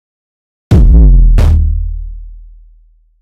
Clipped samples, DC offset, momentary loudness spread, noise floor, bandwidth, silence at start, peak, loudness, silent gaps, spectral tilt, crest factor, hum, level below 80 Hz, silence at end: under 0.1%; under 0.1%; 18 LU; -45 dBFS; 4.9 kHz; 0.7 s; 0 dBFS; -10 LUFS; none; -9 dB/octave; 8 dB; none; -10 dBFS; 0.85 s